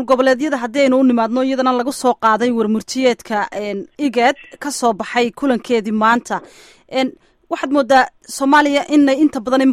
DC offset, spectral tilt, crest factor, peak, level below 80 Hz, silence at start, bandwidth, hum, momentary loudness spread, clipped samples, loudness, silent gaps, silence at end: under 0.1%; -4 dB/octave; 14 dB; -2 dBFS; -56 dBFS; 0 s; 15 kHz; none; 10 LU; under 0.1%; -16 LUFS; none; 0 s